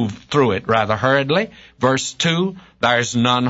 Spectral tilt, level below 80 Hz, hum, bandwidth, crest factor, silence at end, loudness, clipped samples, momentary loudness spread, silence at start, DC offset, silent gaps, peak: -4.5 dB/octave; -52 dBFS; none; 8 kHz; 16 dB; 0 s; -18 LUFS; under 0.1%; 5 LU; 0 s; under 0.1%; none; -2 dBFS